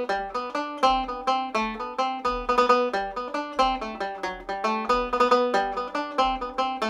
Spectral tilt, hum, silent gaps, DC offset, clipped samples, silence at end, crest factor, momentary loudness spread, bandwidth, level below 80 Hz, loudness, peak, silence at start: -3.5 dB/octave; none; none; under 0.1%; under 0.1%; 0 s; 20 dB; 9 LU; 11.5 kHz; -48 dBFS; -25 LUFS; -6 dBFS; 0 s